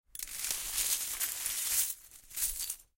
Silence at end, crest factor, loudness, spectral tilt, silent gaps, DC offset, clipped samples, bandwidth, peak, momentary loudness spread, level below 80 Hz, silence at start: 0.15 s; 26 dB; -32 LUFS; 2.5 dB/octave; none; under 0.1%; under 0.1%; 17 kHz; -10 dBFS; 9 LU; -58 dBFS; 0.15 s